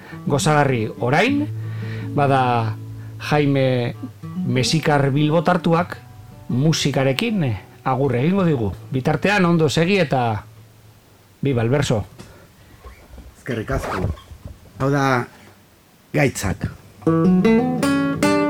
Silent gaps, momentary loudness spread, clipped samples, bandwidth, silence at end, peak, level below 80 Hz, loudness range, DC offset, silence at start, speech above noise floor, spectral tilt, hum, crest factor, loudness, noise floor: none; 12 LU; under 0.1%; 17 kHz; 0 s; 0 dBFS; -44 dBFS; 6 LU; under 0.1%; 0 s; 33 dB; -6 dB/octave; none; 20 dB; -19 LUFS; -52 dBFS